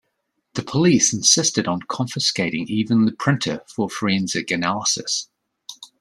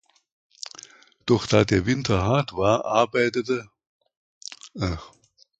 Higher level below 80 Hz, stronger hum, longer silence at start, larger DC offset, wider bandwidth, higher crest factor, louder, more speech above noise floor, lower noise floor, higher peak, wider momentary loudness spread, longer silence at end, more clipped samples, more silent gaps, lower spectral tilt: second, -60 dBFS vs -44 dBFS; neither; second, 0.55 s vs 1.25 s; neither; first, 13.5 kHz vs 9 kHz; about the same, 20 dB vs 22 dB; first, -20 LUFS vs -23 LUFS; first, 53 dB vs 27 dB; first, -74 dBFS vs -49 dBFS; about the same, -2 dBFS vs -2 dBFS; second, 11 LU vs 19 LU; second, 0.15 s vs 0.5 s; neither; second, none vs 3.87-4.00 s, 4.17-4.41 s; second, -3 dB/octave vs -5.5 dB/octave